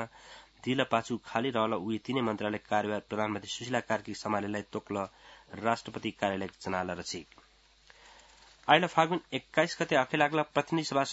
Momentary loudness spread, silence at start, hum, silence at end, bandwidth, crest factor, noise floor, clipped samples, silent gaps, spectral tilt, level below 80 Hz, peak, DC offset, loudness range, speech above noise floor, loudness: 11 LU; 0 s; none; 0 s; 8 kHz; 26 dB; -61 dBFS; under 0.1%; none; -3 dB/octave; -68 dBFS; -6 dBFS; under 0.1%; 7 LU; 30 dB; -31 LUFS